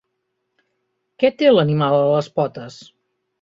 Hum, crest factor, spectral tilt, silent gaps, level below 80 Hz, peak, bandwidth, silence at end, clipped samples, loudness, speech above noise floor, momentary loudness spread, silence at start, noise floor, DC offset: none; 18 dB; -7.5 dB/octave; none; -62 dBFS; -2 dBFS; 7.6 kHz; 0.7 s; under 0.1%; -17 LUFS; 57 dB; 14 LU; 1.2 s; -74 dBFS; under 0.1%